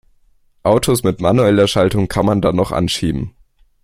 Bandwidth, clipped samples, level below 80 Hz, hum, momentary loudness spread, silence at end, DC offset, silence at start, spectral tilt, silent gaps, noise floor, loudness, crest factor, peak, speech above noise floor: 16.5 kHz; under 0.1%; -38 dBFS; none; 8 LU; 0.55 s; under 0.1%; 0.65 s; -6 dB/octave; none; -54 dBFS; -15 LUFS; 16 dB; 0 dBFS; 39 dB